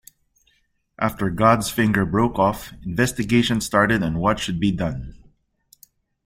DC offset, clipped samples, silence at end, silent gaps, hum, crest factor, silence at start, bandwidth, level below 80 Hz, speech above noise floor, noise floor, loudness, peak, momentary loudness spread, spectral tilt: under 0.1%; under 0.1%; 1.1 s; none; none; 20 dB; 1 s; 16.5 kHz; -42 dBFS; 46 dB; -66 dBFS; -21 LUFS; -2 dBFS; 10 LU; -5.5 dB/octave